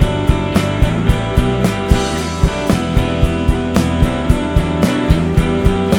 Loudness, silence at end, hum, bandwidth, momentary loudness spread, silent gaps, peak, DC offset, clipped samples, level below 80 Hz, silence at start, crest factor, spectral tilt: -15 LUFS; 0 s; none; 18.5 kHz; 2 LU; none; 0 dBFS; under 0.1%; 0.1%; -20 dBFS; 0 s; 14 dB; -6.5 dB/octave